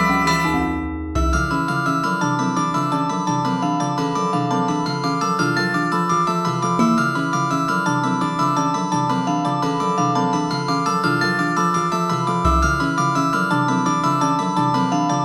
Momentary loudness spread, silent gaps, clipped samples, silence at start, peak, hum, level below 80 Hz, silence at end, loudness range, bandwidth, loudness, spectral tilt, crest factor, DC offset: 3 LU; none; under 0.1%; 0 s; -4 dBFS; none; -34 dBFS; 0 s; 2 LU; 13.5 kHz; -19 LUFS; -5.5 dB/octave; 14 dB; under 0.1%